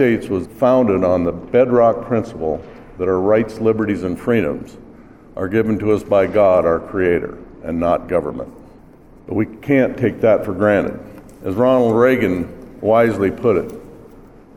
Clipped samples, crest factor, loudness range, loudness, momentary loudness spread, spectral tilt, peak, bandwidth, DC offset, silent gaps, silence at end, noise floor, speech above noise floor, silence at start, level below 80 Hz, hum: under 0.1%; 16 dB; 3 LU; -17 LUFS; 14 LU; -8 dB/octave; -2 dBFS; 14 kHz; 0.2%; none; 0.35 s; -44 dBFS; 28 dB; 0 s; -44 dBFS; none